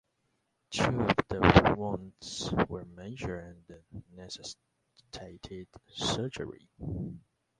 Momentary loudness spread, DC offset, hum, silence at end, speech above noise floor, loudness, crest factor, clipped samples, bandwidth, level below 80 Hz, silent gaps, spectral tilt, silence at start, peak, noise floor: 24 LU; under 0.1%; none; 0.4 s; 46 dB; -30 LUFS; 30 dB; under 0.1%; 11.5 kHz; -46 dBFS; none; -5.5 dB/octave; 0.7 s; -4 dBFS; -78 dBFS